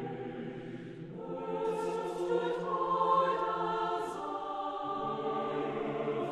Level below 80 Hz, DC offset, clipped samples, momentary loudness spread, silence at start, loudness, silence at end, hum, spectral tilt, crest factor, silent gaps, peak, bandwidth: -68 dBFS; under 0.1%; under 0.1%; 13 LU; 0 s; -34 LUFS; 0 s; none; -6.5 dB/octave; 18 dB; none; -18 dBFS; 12.5 kHz